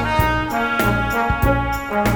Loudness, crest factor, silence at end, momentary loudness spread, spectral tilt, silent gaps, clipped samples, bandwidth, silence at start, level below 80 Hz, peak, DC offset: -19 LUFS; 14 dB; 0 s; 2 LU; -6 dB/octave; none; under 0.1%; over 20 kHz; 0 s; -28 dBFS; -4 dBFS; under 0.1%